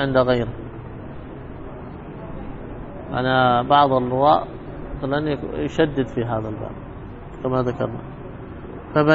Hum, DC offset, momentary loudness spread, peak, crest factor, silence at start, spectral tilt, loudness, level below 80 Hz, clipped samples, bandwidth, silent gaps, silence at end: none; under 0.1%; 19 LU; -2 dBFS; 20 dB; 0 s; -8 dB/octave; -21 LUFS; -40 dBFS; under 0.1%; 7.6 kHz; none; 0 s